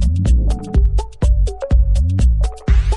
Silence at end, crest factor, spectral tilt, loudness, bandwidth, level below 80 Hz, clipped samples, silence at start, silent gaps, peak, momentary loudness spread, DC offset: 0 s; 10 dB; -7.5 dB/octave; -17 LUFS; 10 kHz; -14 dBFS; under 0.1%; 0 s; none; -4 dBFS; 4 LU; under 0.1%